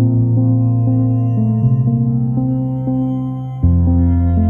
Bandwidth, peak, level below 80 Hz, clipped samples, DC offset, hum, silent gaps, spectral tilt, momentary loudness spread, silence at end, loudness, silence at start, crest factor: 2.2 kHz; -4 dBFS; -28 dBFS; under 0.1%; under 0.1%; none; none; -13.5 dB/octave; 5 LU; 0 s; -15 LUFS; 0 s; 10 dB